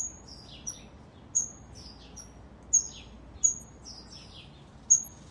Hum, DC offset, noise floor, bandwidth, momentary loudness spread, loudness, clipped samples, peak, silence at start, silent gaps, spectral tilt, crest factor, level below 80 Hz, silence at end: none; under 0.1%; -51 dBFS; 12 kHz; 24 LU; -27 LUFS; under 0.1%; -10 dBFS; 0 s; none; -1 dB/octave; 24 dB; -54 dBFS; 0.15 s